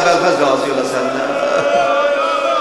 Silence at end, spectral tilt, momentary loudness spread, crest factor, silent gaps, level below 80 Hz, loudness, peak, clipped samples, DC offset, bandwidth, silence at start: 0 s; -3.5 dB/octave; 5 LU; 14 dB; none; -60 dBFS; -15 LUFS; 0 dBFS; under 0.1%; 0.2%; 12.5 kHz; 0 s